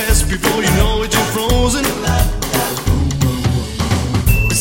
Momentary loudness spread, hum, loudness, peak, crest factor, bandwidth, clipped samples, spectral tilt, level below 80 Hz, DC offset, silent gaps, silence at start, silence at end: 4 LU; none; -16 LUFS; 0 dBFS; 14 dB; 17 kHz; under 0.1%; -4.5 dB/octave; -20 dBFS; under 0.1%; none; 0 s; 0 s